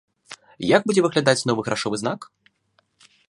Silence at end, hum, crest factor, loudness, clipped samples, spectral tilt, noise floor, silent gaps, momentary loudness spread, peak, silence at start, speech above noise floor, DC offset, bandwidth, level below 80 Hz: 1.05 s; none; 22 dB; -21 LUFS; under 0.1%; -4.5 dB/octave; -67 dBFS; none; 23 LU; 0 dBFS; 0.3 s; 46 dB; under 0.1%; 11.5 kHz; -62 dBFS